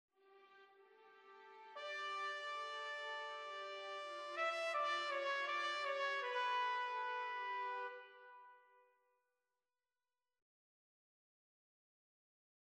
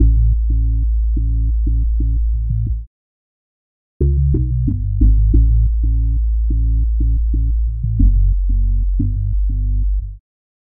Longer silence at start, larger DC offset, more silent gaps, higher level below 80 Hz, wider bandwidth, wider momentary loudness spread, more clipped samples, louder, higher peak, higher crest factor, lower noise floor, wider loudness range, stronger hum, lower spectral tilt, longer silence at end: first, 0.25 s vs 0 s; neither; second, none vs 2.87-4.00 s; second, under -90 dBFS vs -16 dBFS; first, 12 kHz vs 0.5 kHz; first, 19 LU vs 6 LU; neither; second, -42 LUFS vs -18 LUFS; second, -28 dBFS vs -2 dBFS; about the same, 18 dB vs 14 dB; about the same, under -90 dBFS vs under -90 dBFS; first, 8 LU vs 4 LU; neither; second, 1.5 dB/octave vs -15 dB/octave; first, 4.05 s vs 0.45 s